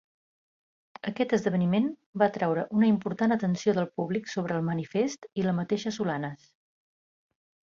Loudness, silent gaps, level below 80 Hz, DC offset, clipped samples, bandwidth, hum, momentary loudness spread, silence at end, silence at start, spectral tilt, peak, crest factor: -28 LUFS; 2.06-2.13 s; -70 dBFS; under 0.1%; under 0.1%; 7.4 kHz; none; 6 LU; 1.4 s; 1.05 s; -7 dB/octave; -10 dBFS; 18 dB